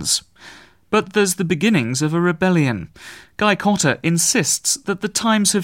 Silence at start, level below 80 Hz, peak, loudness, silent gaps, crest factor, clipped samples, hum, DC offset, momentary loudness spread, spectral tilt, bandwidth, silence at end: 0 s; -54 dBFS; -2 dBFS; -18 LUFS; none; 16 dB; under 0.1%; none; 0.1%; 6 LU; -3.5 dB/octave; 16.5 kHz; 0 s